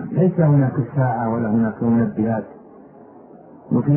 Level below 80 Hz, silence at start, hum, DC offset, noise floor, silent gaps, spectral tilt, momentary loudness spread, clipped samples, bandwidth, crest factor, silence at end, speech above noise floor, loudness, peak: -54 dBFS; 0 s; none; under 0.1%; -43 dBFS; none; -14.5 dB/octave; 7 LU; under 0.1%; 2.9 kHz; 16 dB; 0 s; 26 dB; -19 LUFS; -4 dBFS